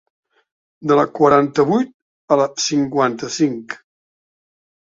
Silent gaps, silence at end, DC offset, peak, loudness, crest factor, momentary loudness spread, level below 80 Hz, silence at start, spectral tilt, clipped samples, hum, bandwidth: 1.94-2.28 s; 1.1 s; under 0.1%; 0 dBFS; -17 LUFS; 18 dB; 14 LU; -58 dBFS; 0.8 s; -5 dB/octave; under 0.1%; none; 7.8 kHz